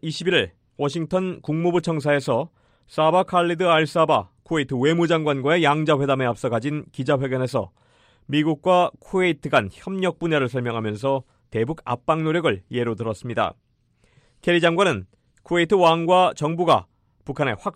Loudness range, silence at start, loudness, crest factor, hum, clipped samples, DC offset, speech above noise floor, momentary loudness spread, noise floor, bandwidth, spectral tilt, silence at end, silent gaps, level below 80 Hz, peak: 4 LU; 0.05 s; -22 LUFS; 18 dB; none; under 0.1%; under 0.1%; 42 dB; 9 LU; -63 dBFS; 12.5 kHz; -6 dB/octave; 0.05 s; none; -58 dBFS; -4 dBFS